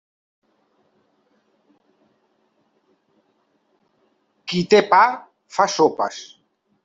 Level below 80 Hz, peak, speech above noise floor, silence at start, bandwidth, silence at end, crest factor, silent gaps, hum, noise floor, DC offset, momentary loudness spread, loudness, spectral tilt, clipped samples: -68 dBFS; -2 dBFS; 49 dB; 4.45 s; 7.8 kHz; 0.6 s; 22 dB; none; none; -66 dBFS; under 0.1%; 21 LU; -18 LUFS; -4 dB/octave; under 0.1%